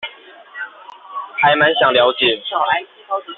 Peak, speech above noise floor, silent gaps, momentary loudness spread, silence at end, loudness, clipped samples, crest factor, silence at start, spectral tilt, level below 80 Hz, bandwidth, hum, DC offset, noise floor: -2 dBFS; 25 dB; none; 19 LU; 0.05 s; -15 LUFS; under 0.1%; 16 dB; 0 s; 0 dB/octave; -60 dBFS; 4.3 kHz; none; under 0.1%; -40 dBFS